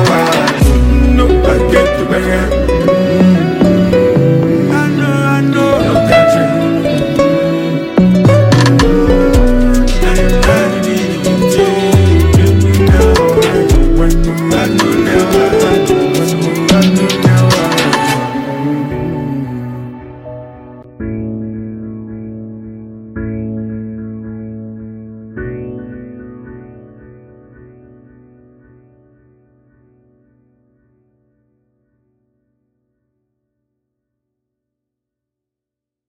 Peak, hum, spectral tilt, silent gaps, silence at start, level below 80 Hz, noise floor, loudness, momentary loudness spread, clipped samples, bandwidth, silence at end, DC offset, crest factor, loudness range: 0 dBFS; none; -6 dB/octave; none; 0 s; -20 dBFS; -84 dBFS; -11 LUFS; 19 LU; under 0.1%; 17 kHz; 9.3 s; under 0.1%; 12 dB; 16 LU